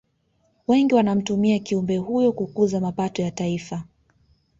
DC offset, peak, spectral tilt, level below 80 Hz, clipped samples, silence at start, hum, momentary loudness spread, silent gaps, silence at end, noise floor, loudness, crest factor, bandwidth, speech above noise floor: under 0.1%; -6 dBFS; -6.5 dB/octave; -58 dBFS; under 0.1%; 0.7 s; none; 10 LU; none; 0.75 s; -67 dBFS; -22 LUFS; 16 dB; 7.8 kHz; 45 dB